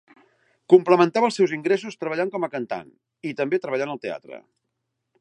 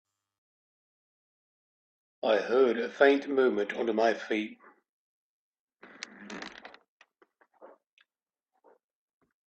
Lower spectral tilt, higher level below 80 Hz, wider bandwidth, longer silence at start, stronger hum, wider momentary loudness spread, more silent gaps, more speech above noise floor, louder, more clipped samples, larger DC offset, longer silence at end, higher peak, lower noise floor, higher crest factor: first, -6 dB/octave vs -4.5 dB/octave; about the same, -76 dBFS vs -80 dBFS; first, 10 kHz vs 8 kHz; second, 0.7 s vs 2.25 s; neither; second, 16 LU vs 21 LU; second, none vs 4.89-5.53 s, 5.59-5.68 s, 6.88-7.00 s; second, 56 dB vs over 63 dB; first, -22 LUFS vs -27 LUFS; neither; neither; second, 0.8 s vs 1.8 s; first, -2 dBFS vs -8 dBFS; second, -78 dBFS vs under -90 dBFS; about the same, 22 dB vs 24 dB